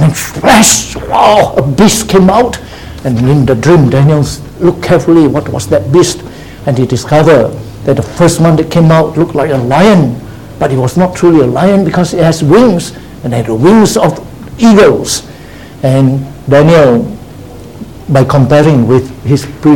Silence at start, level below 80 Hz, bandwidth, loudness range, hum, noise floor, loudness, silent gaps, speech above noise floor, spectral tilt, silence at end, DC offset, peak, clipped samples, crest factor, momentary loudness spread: 0 s; -32 dBFS; 18.5 kHz; 2 LU; none; -29 dBFS; -8 LUFS; none; 22 dB; -5.5 dB/octave; 0 s; 0.9%; 0 dBFS; 2%; 8 dB; 11 LU